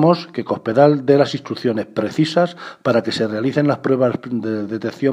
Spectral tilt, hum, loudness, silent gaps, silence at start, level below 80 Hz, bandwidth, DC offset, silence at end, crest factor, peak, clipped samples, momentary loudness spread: -7 dB/octave; none; -18 LUFS; none; 0 s; -64 dBFS; 11 kHz; under 0.1%; 0 s; 18 dB; 0 dBFS; under 0.1%; 9 LU